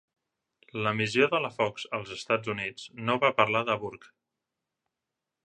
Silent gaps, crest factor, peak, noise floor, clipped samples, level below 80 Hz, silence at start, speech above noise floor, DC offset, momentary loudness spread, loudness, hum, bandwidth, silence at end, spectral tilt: none; 26 dB; -6 dBFS; -87 dBFS; under 0.1%; -70 dBFS; 0.75 s; 59 dB; under 0.1%; 11 LU; -28 LUFS; none; 11 kHz; 1.4 s; -5 dB/octave